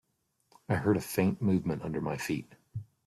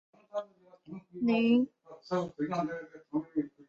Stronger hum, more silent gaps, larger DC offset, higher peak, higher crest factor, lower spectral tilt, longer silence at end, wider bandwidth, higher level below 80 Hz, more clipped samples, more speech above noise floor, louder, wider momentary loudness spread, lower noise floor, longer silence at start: neither; neither; neither; about the same, -14 dBFS vs -16 dBFS; about the same, 18 dB vs 18 dB; about the same, -6.5 dB/octave vs -7 dB/octave; about the same, 0.25 s vs 0.2 s; first, 14 kHz vs 7 kHz; first, -62 dBFS vs -76 dBFS; neither; first, 47 dB vs 24 dB; about the same, -31 LUFS vs -32 LUFS; second, 15 LU vs 20 LU; first, -77 dBFS vs -55 dBFS; first, 0.7 s vs 0.35 s